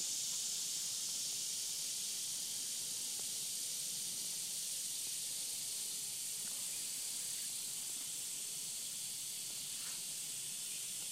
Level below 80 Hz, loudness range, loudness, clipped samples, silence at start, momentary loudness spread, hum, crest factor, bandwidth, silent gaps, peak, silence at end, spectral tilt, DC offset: -84 dBFS; 2 LU; -39 LUFS; under 0.1%; 0 s; 3 LU; none; 14 dB; 16 kHz; none; -28 dBFS; 0 s; 1.5 dB/octave; under 0.1%